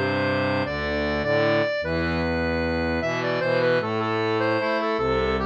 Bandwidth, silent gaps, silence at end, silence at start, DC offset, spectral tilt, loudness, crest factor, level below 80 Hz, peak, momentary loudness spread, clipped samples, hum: 8.4 kHz; none; 0 s; 0 s; under 0.1%; -6.5 dB/octave; -23 LUFS; 12 dB; -42 dBFS; -10 dBFS; 3 LU; under 0.1%; none